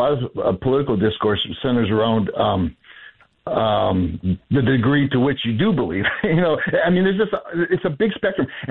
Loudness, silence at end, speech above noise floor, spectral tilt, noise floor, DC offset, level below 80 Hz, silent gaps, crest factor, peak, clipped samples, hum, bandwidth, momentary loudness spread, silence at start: -20 LUFS; 0 s; 27 dB; -10 dB/octave; -46 dBFS; under 0.1%; -46 dBFS; none; 12 dB; -8 dBFS; under 0.1%; none; 4.2 kHz; 5 LU; 0 s